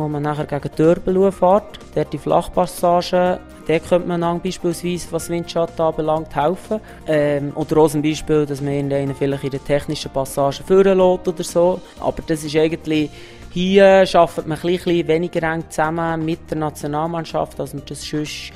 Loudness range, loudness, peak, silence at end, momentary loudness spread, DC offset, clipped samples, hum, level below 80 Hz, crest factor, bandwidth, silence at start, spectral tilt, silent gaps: 4 LU; -19 LUFS; 0 dBFS; 0 s; 10 LU; under 0.1%; under 0.1%; none; -42 dBFS; 18 dB; 15.5 kHz; 0 s; -6 dB/octave; none